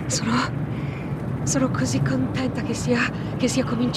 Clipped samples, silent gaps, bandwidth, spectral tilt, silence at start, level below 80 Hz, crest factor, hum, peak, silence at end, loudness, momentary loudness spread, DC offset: under 0.1%; none; 13.5 kHz; -5 dB/octave; 0 s; -44 dBFS; 16 dB; none; -8 dBFS; 0 s; -24 LUFS; 6 LU; under 0.1%